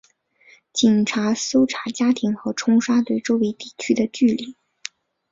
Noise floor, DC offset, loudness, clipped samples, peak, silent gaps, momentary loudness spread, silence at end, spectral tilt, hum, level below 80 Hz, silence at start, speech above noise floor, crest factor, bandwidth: -55 dBFS; under 0.1%; -20 LUFS; under 0.1%; -4 dBFS; none; 16 LU; 0.8 s; -4.5 dB/octave; none; -62 dBFS; 0.75 s; 36 dB; 18 dB; 7.8 kHz